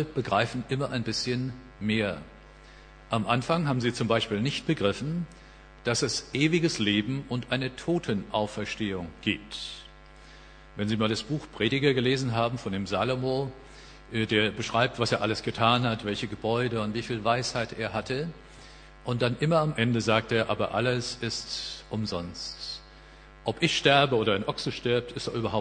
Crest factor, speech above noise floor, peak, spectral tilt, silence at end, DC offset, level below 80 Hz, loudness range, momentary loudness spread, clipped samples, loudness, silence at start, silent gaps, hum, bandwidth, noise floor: 22 dB; 22 dB; -6 dBFS; -5 dB/octave; 0 s; under 0.1%; -52 dBFS; 4 LU; 11 LU; under 0.1%; -28 LUFS; 0 s; none; none; 10 kHz; -50 dBFS